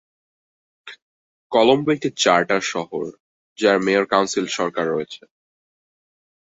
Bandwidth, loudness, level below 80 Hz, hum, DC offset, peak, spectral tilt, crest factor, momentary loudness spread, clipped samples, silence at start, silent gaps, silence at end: 8 kHz; -19 LUFS; -64 dBFS; none; under 0.1%; -2 dBFS; -3.5 dB/octave; 20 dB; 13 LU; under 0.1%; 0.85 s; 1.02-1.50 s, 3.20-3.56 s; 1.3 s